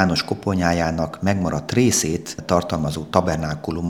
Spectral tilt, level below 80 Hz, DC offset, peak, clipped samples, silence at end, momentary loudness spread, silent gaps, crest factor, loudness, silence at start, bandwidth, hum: -5 dB/octave; -44 dBFS; 0.1%; 0 dBFS; under 0.1%; 0 s; 7 LU; none; 20 dB; -21 LUFS; 0 s; 18 kHz; none